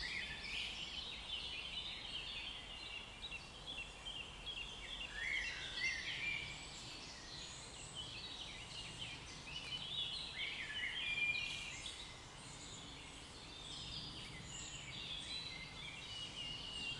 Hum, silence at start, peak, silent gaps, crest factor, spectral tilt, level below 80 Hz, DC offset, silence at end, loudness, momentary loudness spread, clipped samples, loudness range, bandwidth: none; 0 s; -28 dBFS; none; 18 dB; -1.5 dB/octave; -62 dBFS; under 0.1%; 0 s; -45 LUFS; 10 LU; under 0.1%; 6 LU; 12 kHz